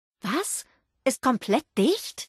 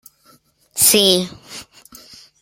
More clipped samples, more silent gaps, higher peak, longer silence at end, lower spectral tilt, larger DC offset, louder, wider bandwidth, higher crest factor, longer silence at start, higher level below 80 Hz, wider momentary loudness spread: neither; neither; second, -10 dBFS vs 0 dBFS; second, 0 s vs 0.8 s; first, -4 dB/octave vs -2 dB/octave; neither; second, -26 LUFS vs -13 LUFS; second, 12.5 kHz vs 16.5 kHz; about the same, 16 dB vs 20 dB; second, 0.25 s vs 0.75 s; second, -68 dBFS vs -58 dBFS; second, 6 LU vs 24 LU